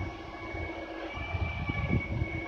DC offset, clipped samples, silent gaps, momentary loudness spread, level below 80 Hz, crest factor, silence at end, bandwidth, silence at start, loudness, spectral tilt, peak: under 0.1%; under 0.1%; none; 8 LU; -42 dBFS; 18 dB; 0 s; 6.8 kHz; 0 s; -35 LUFS; -7.5 dB/octave; -16 dBFS